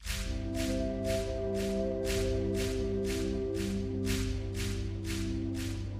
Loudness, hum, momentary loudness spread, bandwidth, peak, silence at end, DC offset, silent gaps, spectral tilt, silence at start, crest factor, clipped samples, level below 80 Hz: -34 LUFS; none; 4 LU; 15.5 kHz; -18 dBFS; 0 s; under 0.1%; none; -5.5 dB/octave; 0 s; 14 dB; under 0.1%; -40 dBFS